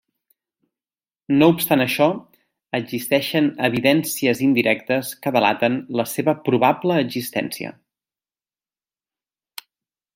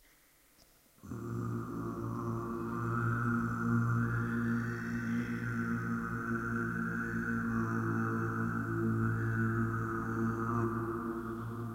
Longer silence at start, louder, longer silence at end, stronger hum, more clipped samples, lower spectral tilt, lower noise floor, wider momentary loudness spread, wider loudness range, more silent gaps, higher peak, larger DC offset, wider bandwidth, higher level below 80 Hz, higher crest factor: first, 1.3 s vs 1.05 s; first, -20 LUFS vs -35 LUFS; first, 2.45 s vs 0 s; neither; neither; second, -5 dB/octave vs -8.5 dB/octave; first, under -90 dBFS vs -65 dBFS; first, 13 LU vs 6 LU; first, 5 LU vs 2 LU; neither; first, -2 dBFS vs -20 dBFS; neither; about the same, 16.5 kHz vs 16 kHz; second, -64 dBFS vs -56 dBFS; first, 20 dB vs 14 dB